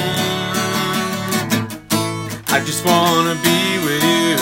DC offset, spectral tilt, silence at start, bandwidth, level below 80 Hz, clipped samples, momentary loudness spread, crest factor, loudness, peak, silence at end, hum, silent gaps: under 0.1%; -3.5 dB/octave; 0 s; 17 kHz; -52 dBFS; under 0.1%; 6 LU; 18 dB; -17 LUFS; 0 dBFS; 0 s; none; none